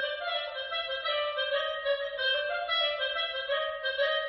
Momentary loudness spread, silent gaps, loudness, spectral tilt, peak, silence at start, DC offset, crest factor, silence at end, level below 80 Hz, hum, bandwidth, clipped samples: 5 LU; none; -30 LUFS; 5.5 dB/octave; -18 dBFS; 0 s; under 0.1%; 14 dB; 0 s; -66 dBFS; none; 6 kHz; under 0.1%